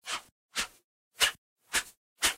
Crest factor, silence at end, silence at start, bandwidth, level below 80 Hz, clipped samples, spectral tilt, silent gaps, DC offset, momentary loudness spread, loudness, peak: 24 dB; 0 s; 0.05 s; 16 kHz; -60 dBFS; under 0.1%; 1.5 dB/octave; 0.32-0.49 s, 0.84-1.11 s, 1.38-1.56 s, 1.97-2.16 s; under 0.1%; 14 LU; -31 LUFS; -10 dBFS